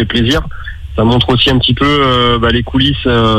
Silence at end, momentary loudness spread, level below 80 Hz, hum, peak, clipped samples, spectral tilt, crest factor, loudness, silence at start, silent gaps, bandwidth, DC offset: 0 s; 7 LU; -24 dBFS; none; 0 dBFS; under 0.1%; -6 dB/octave; 10 dB; -11 LUFS; 0 s; none; 14 kHz; under 0.1%